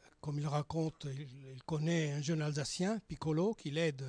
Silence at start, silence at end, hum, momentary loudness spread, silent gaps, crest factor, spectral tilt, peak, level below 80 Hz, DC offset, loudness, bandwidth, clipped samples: 0.25 s; 0 s; none; 10 LU; none; 14 dB; -6 dB/octave; -22 dBFS; -66 dBFS; under 0.1%; -37 LUFS; 10.5 kHz; under 0.1%